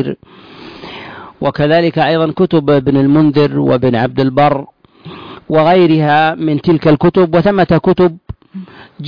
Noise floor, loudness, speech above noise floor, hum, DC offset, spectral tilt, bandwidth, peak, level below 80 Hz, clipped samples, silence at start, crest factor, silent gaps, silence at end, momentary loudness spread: -34 dBFS; -11 LUFS; 23 dB; none; under 0.1%; -9.5 dB/octave; 5.2 kHz; -2 dBFS; -42 dBFS; under 0.1%; 0 s; 10 dB; none; 0 s; 21 LU